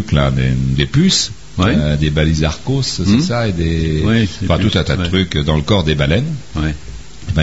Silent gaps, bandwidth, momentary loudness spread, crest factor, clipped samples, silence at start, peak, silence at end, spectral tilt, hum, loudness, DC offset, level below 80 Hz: none; 8 kHz; 7 LU; 14 dB; under 0.1%; 0 s; 0 dBFS; 0 s; -5.5 dB/octave; none; -15 LUFS; 2%; -26 dBFS